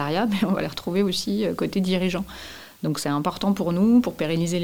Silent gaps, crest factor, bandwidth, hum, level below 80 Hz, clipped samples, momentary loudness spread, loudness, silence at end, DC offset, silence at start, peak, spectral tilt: none; 14 dB; 18 kHz; none; -52 dBFS; under 0.1%; 11 LU; -23 LUFS; 0 s; 0.4%; 0 s; -8 dBFS; -6 dB/octave